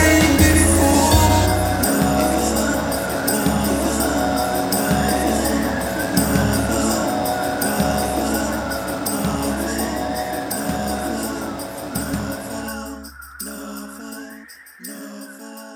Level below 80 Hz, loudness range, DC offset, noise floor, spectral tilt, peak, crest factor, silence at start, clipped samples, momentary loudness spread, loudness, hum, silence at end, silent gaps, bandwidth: -32 dBFS; 12 LU; under 0.1%; -41 dBFS; -4.5 dB/octave; 0 dBFS; 18 dB; 0 s; under 0.1%; 19 LU; -19 LUFS; none; 0 s; none; 19 kHz